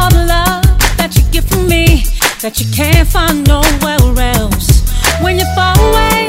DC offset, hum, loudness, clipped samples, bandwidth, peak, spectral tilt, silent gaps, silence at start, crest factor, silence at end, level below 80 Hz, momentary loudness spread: 0.3%; none; -11 LUFS; 0.6%; 16.5 kHz; 0 dBFS; -4.5 dB/octave; none; 0 s; 10 dB; 0 s; -12 dBFS; 4 LU